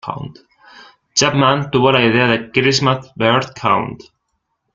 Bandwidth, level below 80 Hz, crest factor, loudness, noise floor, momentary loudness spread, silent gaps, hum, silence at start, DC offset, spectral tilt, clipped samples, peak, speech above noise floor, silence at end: 9.4 kHz; -50 dBFS; 16 dB; -15 LUFS; -71 dBFS; 13 LU; none; none; 0.05 s; under 0.1%; -4 dB/octave; under 0.1%; 0 dBFS; 55 dB; 0.8 s